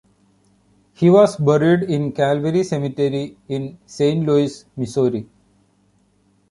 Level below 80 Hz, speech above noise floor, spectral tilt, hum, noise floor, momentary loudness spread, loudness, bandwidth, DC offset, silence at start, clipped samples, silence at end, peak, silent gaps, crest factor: -58 dBFS; 42 dB; -7.5 dB/octave; none; -60 dBFS; 14 LU; -18 LUFS; 11.5 kHz; under 0.1%; 1 s; under 0.1%; 1.25 s; -2 dBFS; none; 16 dB